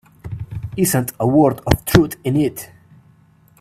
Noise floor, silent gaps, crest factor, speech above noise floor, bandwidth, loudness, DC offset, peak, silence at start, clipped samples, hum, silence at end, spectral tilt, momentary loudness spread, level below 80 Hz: -52 dBFS; none; 18 dB; 35 dB; 16 kHz; -17 LUFS; under 0.1%; 0 dBFS; 0.25 s; under 0.1%; none; 0.95 s; -6 dB/octave; 18 LU; -36 dBFS